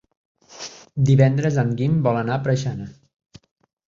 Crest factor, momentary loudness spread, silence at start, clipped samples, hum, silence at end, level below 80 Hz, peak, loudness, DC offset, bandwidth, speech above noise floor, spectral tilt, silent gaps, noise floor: 18 dB; 20 LU; 0.5 s; under 0.1%; none; 0.95 s; -52 dBFS; -2 dBFS; -20 LUFS; under 0.1%; 7.4 kHz; 21 dB; -7.5 dB/octave; none; -39 dBFS